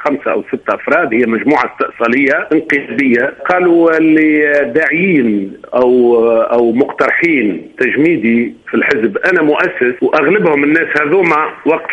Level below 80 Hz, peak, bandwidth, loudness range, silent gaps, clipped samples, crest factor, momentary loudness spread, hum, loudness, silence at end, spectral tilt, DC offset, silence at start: -54 dBFS; 0 dBFS; 8.2 kHz; 2 LU; none; under 0.1%; 12 dB; 6 LU; none; -12 LUFS; 0 s; -7.5 dB/octave; under 0.1%; 0 s